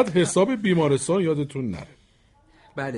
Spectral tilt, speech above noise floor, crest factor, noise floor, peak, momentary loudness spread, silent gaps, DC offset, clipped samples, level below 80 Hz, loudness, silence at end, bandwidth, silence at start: -5.5 dB/octave; 37 dB; 18 dB; -59 dBFS; -6 dBFS; 13 LU; none; under 0.1%; under 0.1%; -56 dBFS; -23 LUFS; 0 s; 11.5 kHz; 0 s